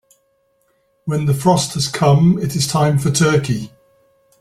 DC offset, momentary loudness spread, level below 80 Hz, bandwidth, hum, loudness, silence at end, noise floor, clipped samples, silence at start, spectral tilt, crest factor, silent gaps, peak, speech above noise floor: under 0.1%; 10 LU; -48 dBFS; 14.5 kHz; none; -16 LUFS; 0.75 s; -62 dBFS; under 0.1%; 1.05 s; -5.5 dB/octave; 16 dB; none; -2 dBFS; 47 dB